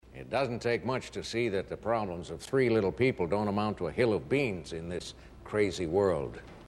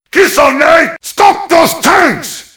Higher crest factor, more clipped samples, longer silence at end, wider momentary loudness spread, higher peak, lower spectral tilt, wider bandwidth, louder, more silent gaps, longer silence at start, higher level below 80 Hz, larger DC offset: first, 18 dB vs 8 dB; second, under 0.1% vs 4%; second, 0 s vs 0.15 s; first, 11 LU vs 5 LU; second, -14 dBFS vs 0 dBFS; first, -6 dB/octave vs -2.5 dB/octave; second, 12.5 kHz vs over 20 kHz; second, -31 LUFS vs -8 LUFS; neither; about the same, 0.05 s vs 0.15 s; second, -54 dBFS vs -42 dBFS; neither